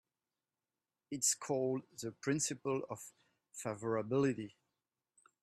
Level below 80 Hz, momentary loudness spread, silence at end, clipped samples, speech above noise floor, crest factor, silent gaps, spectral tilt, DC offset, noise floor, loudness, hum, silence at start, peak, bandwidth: -80 dBFS; 15 LU; 0.95 s; under 0.1%; over 52 dB; 20 dB; none; -4 dB/octave; under 0.1%; under -90 dBFS; -37 LUFS; none; 1.1 s; -20 dBFS; 13.5 kHz